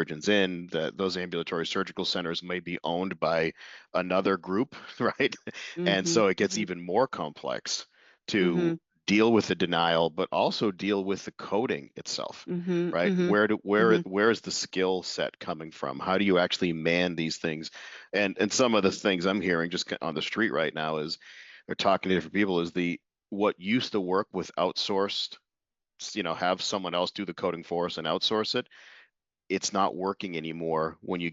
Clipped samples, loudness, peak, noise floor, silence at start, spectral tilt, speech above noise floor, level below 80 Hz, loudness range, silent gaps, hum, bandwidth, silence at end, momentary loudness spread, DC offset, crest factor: under 0.1%; -28 LUFS; -8 dBFS; -88 dBFS; 0 s; -3.5 dB/octave; 60 dB; -72 dBFS; 4 LU; none; none; 8 kHz; 0 s; 10 LU; under 0.1%; 20 dB